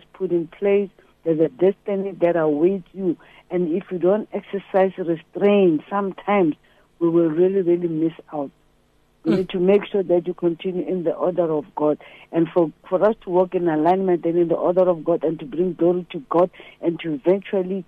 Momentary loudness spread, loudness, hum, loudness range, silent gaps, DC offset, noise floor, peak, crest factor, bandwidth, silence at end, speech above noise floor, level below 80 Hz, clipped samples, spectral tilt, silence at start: 8 LU; -21 LUFS; none; 2 LU; none; under 0.1%; -60 dBFS; -6 dBFS; 14 dB; 4.6 kHz; 0.05 s; 39 dB; -60 dBFS; under 0.1%; -9.5 dB/octave; 0.2 s